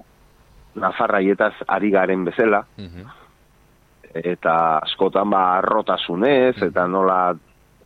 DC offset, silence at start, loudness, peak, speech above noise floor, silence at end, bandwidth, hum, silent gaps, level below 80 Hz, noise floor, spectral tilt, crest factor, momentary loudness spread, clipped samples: under 0.1%; 0.75 s; -19 LUFS; -4 dBFS; 36 dB; 0.5 s; 6.2 kHz; 50 Hz at -55 dBFS; none; -56 dBFS; -55 dBFS; -7.5 dB/octave; 18 dB; 11 LU; under 0.1%